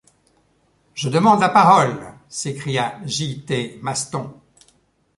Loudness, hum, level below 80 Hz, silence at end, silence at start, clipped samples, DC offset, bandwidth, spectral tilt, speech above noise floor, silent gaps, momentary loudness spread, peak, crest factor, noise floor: -19 LUFS; none; -58 dBFS; 0.85 s; 0.95 s; under 0.1%; under 0.1%; 11.5 kHz; -4.5 dB/octave; 43 dB; none; 18 LU; -2 dBFS; 20 dB; -61 dBFS